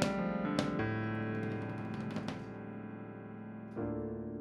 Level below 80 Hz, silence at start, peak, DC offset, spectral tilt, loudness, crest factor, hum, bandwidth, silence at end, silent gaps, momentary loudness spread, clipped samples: -60 dBFS; 0 s; -16 dBFS; under 0.1%; -6.5 dB/octave; -39 LUFS; 22 dB; none; 12 kHz; 0 s; none; 12 LU; under 0.1%